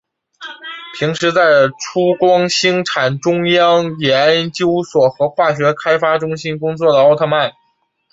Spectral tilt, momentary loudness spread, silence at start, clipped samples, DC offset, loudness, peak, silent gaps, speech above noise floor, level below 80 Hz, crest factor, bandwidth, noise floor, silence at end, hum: -4.5 dB/octave; 10 LU; 0.4 s; under 0.1%; under 0.1%; -14 LUFS; 0 dBFS; none; 49 dB; -58 dBFS; 14 dB; 8 kHz; -63 dBFS; 0.65 s; none